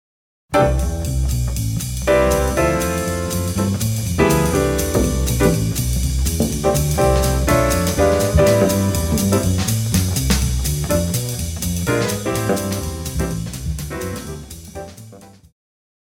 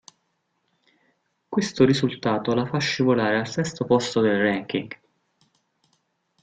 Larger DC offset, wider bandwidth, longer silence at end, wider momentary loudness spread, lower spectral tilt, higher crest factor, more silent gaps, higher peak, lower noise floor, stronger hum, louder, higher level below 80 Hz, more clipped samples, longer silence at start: neither; first, 17.5 kHz vs 9.2 kHz; second, 0.75 s vs 1.5 s; about the same, 10 LU vs 9 LU; about the same, -5 dB/octave vs -5.5 dB/octave; second, 16 dB vs 22 dB; neither; about the same, -2 dBFS vs -4 dBFS; second, -41 dBFS vs -73 dBFS; neither; first, -18 LUFS vs -23 LUFS; first, -26 dBFS vs -60 dBFS; neither; second, 0.5 s vs 1.5 s